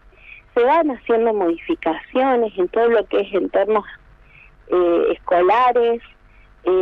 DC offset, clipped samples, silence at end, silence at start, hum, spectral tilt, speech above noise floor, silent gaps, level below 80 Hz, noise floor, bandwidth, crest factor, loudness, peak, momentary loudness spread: under 0.1%; under 0.1%; 0 s; 0.3 s; 50 Hz at -60 dBFS; -7 dB/octave; 31 dB; none; -50 dBFS; -48 dBFS; 5.4 kHz; 12 dB; -18 LUFS; -6 dBFS; 7 LU